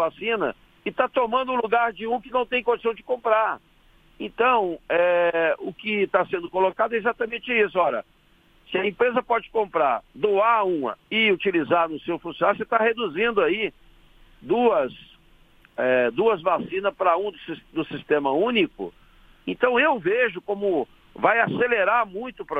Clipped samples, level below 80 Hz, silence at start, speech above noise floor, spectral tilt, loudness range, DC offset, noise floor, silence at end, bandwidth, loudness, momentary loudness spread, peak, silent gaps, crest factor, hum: under 0.1%; -58 dBFS; 0 s; 35 dB; -7 dB/octave; 2 LU; under 0.1%; -58 dBFS; 0 s; 4.8 kHz; -23 LUFS; 10 LU; -4 dBFS; none; 20 dB; none